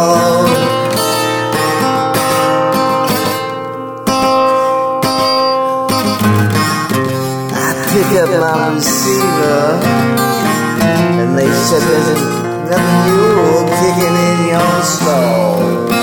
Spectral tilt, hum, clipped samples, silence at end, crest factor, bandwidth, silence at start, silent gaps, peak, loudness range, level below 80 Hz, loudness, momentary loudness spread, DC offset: -4.5 dB/octave; none; under 0.1%; 0 s; 12 dB; 19.5 kHz; 0 s; none; 0 dBFS; 2 LU; -46 dBFS; -12 LUFS; 4 LU; under 0.1%